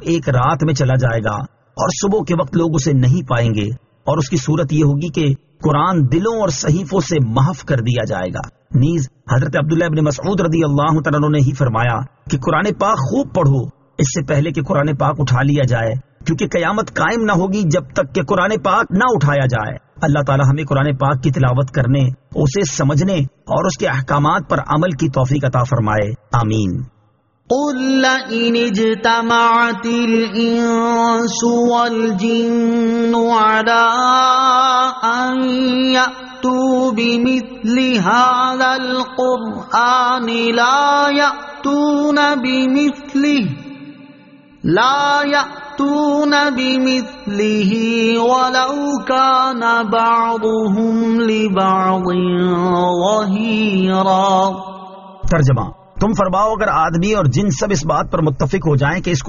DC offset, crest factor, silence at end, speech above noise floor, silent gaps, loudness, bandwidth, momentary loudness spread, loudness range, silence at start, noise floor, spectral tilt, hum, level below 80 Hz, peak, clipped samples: under 0.1%; 14 dB; 0 s; 42 dB; none; -15 LUFS; 7.4 kHz; 7 LU; 3 LU; 0 s; -57 dBFS; -5 dB/octave; none; -40 dBFS; -2 dBFS; under 0.1%